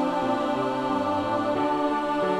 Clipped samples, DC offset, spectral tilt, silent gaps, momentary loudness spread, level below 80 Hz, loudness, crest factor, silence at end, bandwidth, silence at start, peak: under 0.1%; under 0.1%; -6 dB/octave; none; 1 LU; -58 dBFS; -25 LUFS; 12 dB; 0 s; 12 kHz; 0 s; -12 dBFS